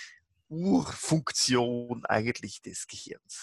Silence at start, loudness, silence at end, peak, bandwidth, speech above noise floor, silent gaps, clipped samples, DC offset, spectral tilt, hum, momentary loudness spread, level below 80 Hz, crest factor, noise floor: 0 s; -29 LUFS; 0 s; -10 dBFS; 12.5 kHz; 22 dB; none; under 0.1%; under 0.1%; -4 dB/octave; none; 16 LU; -64 dBFS; 22 dB; -51 dBFS